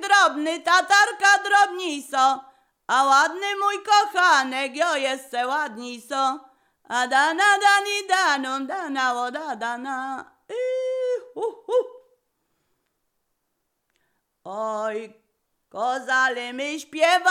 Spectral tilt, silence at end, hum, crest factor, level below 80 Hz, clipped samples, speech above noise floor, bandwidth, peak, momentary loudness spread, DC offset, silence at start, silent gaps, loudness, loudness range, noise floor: 0 dB/octave; 0 s; none; 18 dB; -84 dBFS; under 0.1%; 54 dB; 16 kHz; -6 dBFS; 13 LU; under 0.1%; 0 s; none; -22 LUFS; 13 LU; -76 dBFS